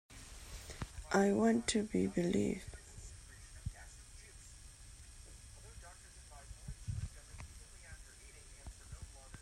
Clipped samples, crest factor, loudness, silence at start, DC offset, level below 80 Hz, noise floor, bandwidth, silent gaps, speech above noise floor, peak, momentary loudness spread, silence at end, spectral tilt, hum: under 0.1%; 22 dB; -37 LUFS; 0.1 s; under 0.1%; -54 dBFS; -56 dBFS; 14.5 kHz; none; 23 dB; -18 dBFS; 23 LU; 0 s; -5 dB/octave; none